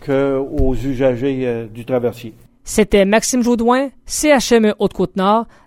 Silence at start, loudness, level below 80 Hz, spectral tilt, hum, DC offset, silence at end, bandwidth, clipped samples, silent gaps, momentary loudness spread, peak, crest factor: 0 s; -16 LUFS; -30 dBFS; -4.5 dB/octave; none; under 0.1%; 0.2 s; 16.5 kHz; under 0.1%; none; 9 LU; -2 dBFS; 14 dB